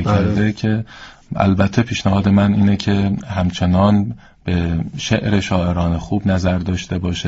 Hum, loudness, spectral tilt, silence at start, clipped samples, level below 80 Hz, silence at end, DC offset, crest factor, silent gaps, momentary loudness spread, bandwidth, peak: none; -17 LUFS; -6.5 dB/octave; 0 s; under 0.1%; -38 dBFS; 0 s; under 0.1%; 16 dB; none; 8 LU; 7.8 kHz; -2 dBFS